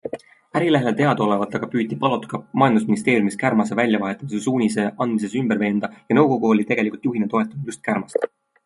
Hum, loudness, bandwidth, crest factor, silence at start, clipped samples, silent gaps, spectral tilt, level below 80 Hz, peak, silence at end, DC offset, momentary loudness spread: none; -21 LUFS; 11.5 kHz; 20 dB; 0.05 s; under 0.1%; none; -6.5 dB/octave; -64 dBFS; 0 dBFS; 0.4 s; under 0.1%; 8 LU